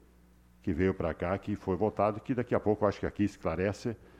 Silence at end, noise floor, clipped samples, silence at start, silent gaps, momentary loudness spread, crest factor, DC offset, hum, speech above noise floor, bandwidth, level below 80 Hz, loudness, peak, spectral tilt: 0.25 s; -60 dBFS; under 0.1%; 0.65 s; none; 5 LU; 20 dB; under 0.1%; none; 29 dB; 12 kHz; -52 dBFS; -32 LUFS; -12 dBFS; -8 dB/octave